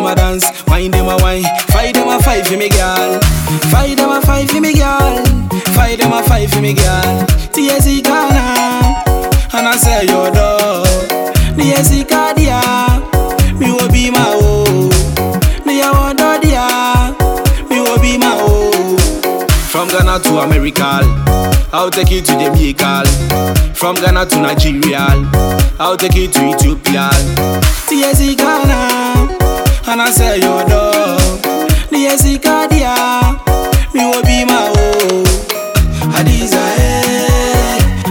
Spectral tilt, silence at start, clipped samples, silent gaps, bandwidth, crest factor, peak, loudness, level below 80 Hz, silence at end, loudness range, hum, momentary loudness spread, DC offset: -4.5 dB/octave; 0 s; under 0.1%; none; 20 kHz; 10 dB; 0 dBFS; -11 LUFS; -16 dBFS; 0 s; 1 LU; none; 3 LU; under 0.1%